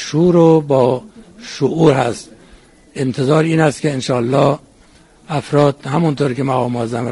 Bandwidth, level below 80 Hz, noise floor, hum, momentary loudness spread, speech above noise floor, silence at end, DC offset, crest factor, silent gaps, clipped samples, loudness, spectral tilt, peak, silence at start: 11.5 kHz; -50 dBFS; -47 dBFS; none; 13 LU; 33 dB; 0 s; under 0.1%; 16 dB; none; under 0.1%; -15 LUFS; -7 dB/octave; 0 dBFS; 0 s